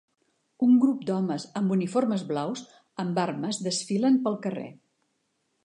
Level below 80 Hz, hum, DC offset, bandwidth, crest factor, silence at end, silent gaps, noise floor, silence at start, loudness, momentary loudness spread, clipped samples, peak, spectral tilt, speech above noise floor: -80 dBFS; none; under 0.1%; 10.5 kHz; 16 dB; 0.9 s; none; -75 dBFS; 0.6 s; -26 LUFS; 13 LU; under 0.1%; -10 dBFS; -6 dB/octave; 49 dB